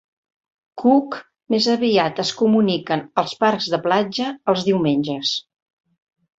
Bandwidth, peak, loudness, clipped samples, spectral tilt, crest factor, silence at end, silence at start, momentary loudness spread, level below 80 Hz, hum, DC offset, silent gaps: 8 kHz; -2 dBFS; -19 LUFS; under 0.1%; -5 dB/octave; 18 dB; 0.95 s; 0.75 s; 6 LU; -64 dBFS; none; under 0.1%; none